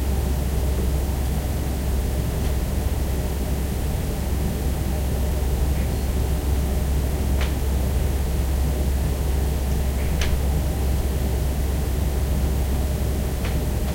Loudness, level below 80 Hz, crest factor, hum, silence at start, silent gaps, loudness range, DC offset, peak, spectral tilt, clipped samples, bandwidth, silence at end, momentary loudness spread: -24 LUFS; -24 dBFS; 14 dB; none; 0 s; none; 1 LU; under 0.1%; -8 dBFS; -6 dB/octave; under 0.1%; 16.5 kHz; 0 s; 2 LU